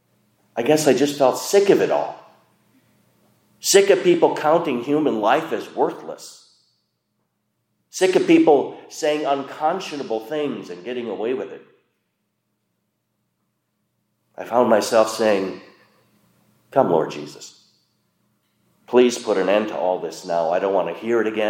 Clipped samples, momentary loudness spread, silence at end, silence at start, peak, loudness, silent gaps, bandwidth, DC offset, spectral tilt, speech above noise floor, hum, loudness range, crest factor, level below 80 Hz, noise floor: under 0.1%; 15 LU; 0 s; 0.55 s; -2 dBFS; -20 LUFS; none; 16.5 kHz; under 0.1%; -4 dB/octave; 54 dB; none; 9 LU; 20 dB; -74 dBFS; -73 dBFS